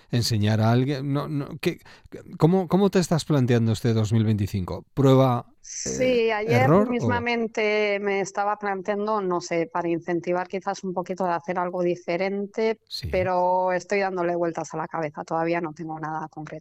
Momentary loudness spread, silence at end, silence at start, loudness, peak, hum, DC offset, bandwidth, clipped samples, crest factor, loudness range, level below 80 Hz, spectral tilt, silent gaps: 10 LU; 0 s; 0.1 s; -24 LUFS; -4 dBFS; none; under 0.1%; 15.5 kHz; under 0.1%; 18 dB; 5 LU; -54 dBFS; -6 dB/octave; none